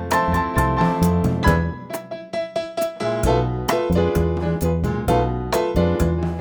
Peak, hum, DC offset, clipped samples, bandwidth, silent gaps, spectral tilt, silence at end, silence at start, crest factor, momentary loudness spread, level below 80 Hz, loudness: -2 dBFS; none; under 0.1%; under 0.1%; over 20 kHz; none; -6.5 dB/octave; 0 s; 0 s; 18 dB; 8 LU; -30 dBFS; -21 LUFS